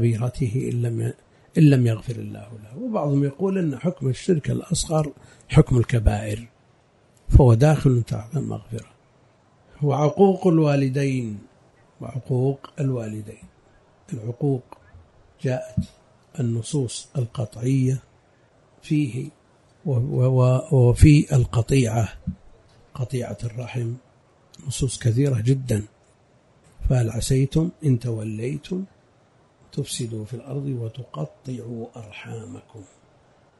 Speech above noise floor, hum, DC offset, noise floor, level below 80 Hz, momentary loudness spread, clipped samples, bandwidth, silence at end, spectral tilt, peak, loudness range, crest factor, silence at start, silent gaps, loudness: 37 dB; none; under 0.1%; -58 dBFS; -36 dBFS; 18 LU; under 0.1%; 11.5 kHz; 0.75 s; -7 dB/octave; -2 dBFS; 11 LU; 22 dB; 0 s; none; -23 LUFS